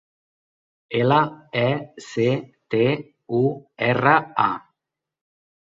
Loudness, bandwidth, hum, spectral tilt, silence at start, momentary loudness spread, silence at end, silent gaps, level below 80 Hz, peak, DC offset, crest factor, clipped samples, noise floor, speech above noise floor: -22 LUFS; 7.8 kHz; none; -7 dB/octave; 0.9 s; 10 LU; 1.2 s; none; -62 dBFS; -2 dBFS; under 0.1%; 20 dB; under 0.1%; -85 dBFS; 64 dB